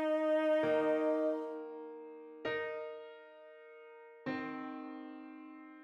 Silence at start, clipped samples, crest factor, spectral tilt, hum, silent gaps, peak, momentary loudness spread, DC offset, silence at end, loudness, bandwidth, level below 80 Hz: 0 s; under 0.1%; 16 dB; -6.5 dB/octave; none; none; -22 dBFS; 23 LU; under 0.1%; 0 s; -36 LUFS; 9.6 kHz; -82 dBFS